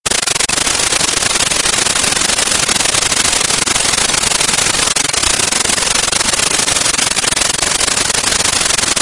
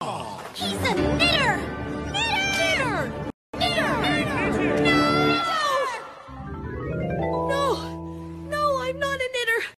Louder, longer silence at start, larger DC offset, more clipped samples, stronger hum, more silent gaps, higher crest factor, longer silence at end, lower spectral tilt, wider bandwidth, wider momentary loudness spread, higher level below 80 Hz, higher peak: first, -11 LUFS vs -23 LUFS; about the same, 0.05 s vs 0 s; neither; neither; neither; second, none vs 3.34-3.53 s; about the same, 14 dB vs 18 dB; about the same, 0 s vs 0.05 s; second, 0 dB/octave vs -4.5 dB/octave; about the same, 12 kHz vs 13 kHz; second, 1 LU vs 15 LU; first, -36 dBFS vs -42 dBFS; first, 0 dBFS vs -6 dBFS